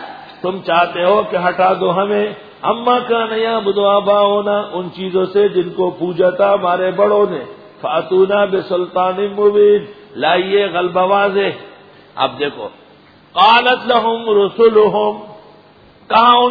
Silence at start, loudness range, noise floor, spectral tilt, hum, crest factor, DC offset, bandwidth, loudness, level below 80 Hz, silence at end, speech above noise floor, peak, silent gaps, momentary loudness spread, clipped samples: 0 s; 2 LU; -45 dBFS; -7.5 dB/octave; none; 14 dB; under 0.1%; 5 kHz; -14 LUFS; -58 dBFS; 0 s; 31 dB; 0 dBFS; none; 11 LU; under 0.1%